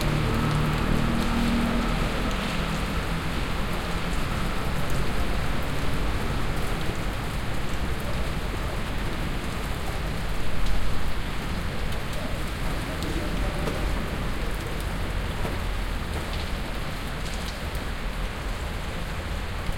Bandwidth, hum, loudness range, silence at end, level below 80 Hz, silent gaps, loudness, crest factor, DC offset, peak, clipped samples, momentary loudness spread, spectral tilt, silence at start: 17 kHz; none; 4 LU; 0 s; -30 dBFS; none; -29 LUFS; 16 dB; under 0.1%; -10 dBFS; under 0.1%; 7 LU; -5.5 dB/octave; 0 s